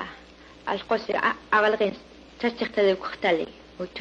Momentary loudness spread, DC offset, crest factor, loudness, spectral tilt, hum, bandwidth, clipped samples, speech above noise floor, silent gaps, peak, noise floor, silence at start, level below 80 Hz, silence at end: 15 LU; under 0.1%; 18 dB; -25 LUFS; -5.5 dB/octave; none; 7.8 kHz; under 0.1%; 24 dB; none; -8 dBFS; -49 dBFS; 0 s; -58 dBFS; 0 s